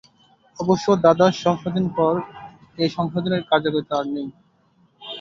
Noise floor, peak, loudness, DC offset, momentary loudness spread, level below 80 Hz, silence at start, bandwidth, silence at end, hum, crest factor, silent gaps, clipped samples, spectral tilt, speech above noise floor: -60 dBFS; -2 dBFS; -21 LUFS; under 0.1%; 19 LU; -58 dBFS; 0.6 s; 7.6 kHz; 0 s; none; 20 dB; none; under 0.1%; -6.5 dB/octave; 40 dB